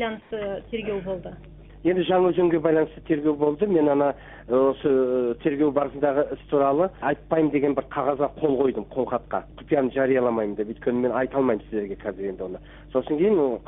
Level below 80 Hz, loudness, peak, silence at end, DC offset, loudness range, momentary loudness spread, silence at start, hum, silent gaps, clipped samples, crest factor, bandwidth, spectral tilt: -50 dBFS; -24 LUFS; -8 dBFS; 0.05 s; under 0.1%; 3 LU; 10 LU; 0 s; none; none; under 0.1%; 16 dB; 3.9 kHz; -11.5 dB/octave